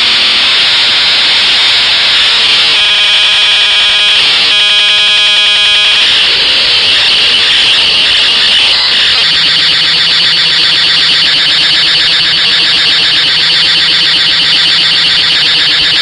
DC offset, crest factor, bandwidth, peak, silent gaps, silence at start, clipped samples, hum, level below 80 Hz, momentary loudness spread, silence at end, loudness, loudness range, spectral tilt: under 0.1%; 8 dB; 12 kHz; 0 dBFS; none; 0 s; 0.2%; none; -42 dBFS; 1 LU; 0 s; -4 LUFS; 1 LU; 0 dB/octave